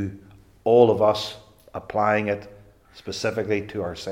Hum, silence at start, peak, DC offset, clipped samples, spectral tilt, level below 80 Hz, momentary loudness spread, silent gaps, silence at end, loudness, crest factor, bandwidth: none; 0 s; -2 dBFS; under 0.1%; under 0.1%; -5.5 dB/octave; -58 dBFS; 20 LU; none; 0 s; -23 LUFS; 20 dB; 14 kHz